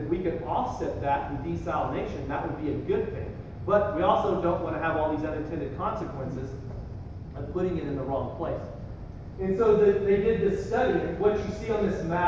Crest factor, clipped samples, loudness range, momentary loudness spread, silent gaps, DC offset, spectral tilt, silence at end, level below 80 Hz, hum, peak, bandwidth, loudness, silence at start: 18 dB; under 0.1%; 7 LU; 15 LU; none; under 0.1%; -8 dB/octave; 0 s; -42 dBFS; none; -8 dBFS; 7.6 kHz; -28 LUFS; 0 s